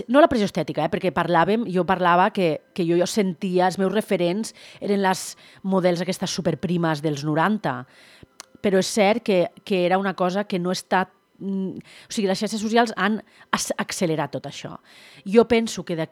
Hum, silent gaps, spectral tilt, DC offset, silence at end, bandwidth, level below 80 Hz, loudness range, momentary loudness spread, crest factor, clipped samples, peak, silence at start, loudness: none; none; -5 dB/octave; under 0.1%; 0.05 s; 16 kHz; -58 dBFS; 3 LU; 12 LU; 22 dB; under 0.1%; -2 dBFS; 0 s; -22 LUFS